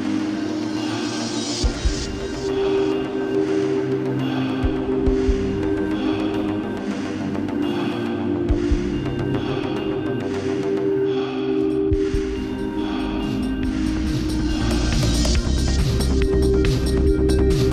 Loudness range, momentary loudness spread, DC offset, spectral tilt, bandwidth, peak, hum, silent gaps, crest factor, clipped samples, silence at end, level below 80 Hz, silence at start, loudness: 3 LU; 5 LU; under 0.1%; -6 dB/octave; 13.5 kHz; -6 dBFS; none; none; 14 dB; under 0.1%; 0 s; -28 dBFS; 0 s; -22 LUFS